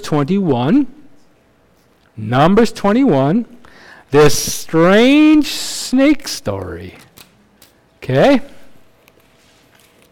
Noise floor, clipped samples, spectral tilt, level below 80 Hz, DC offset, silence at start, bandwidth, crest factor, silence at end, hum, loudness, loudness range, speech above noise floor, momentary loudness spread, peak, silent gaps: -53 dBFS; under 0.1%; -5.5 dB/octave; -40 dBFS; under 0.1%; 0 s; 17 kHz; 10 dB; 1.35 s; none; -13 LUFS; 7 LU; 41 dB; 16 LU; -4 dBFS; none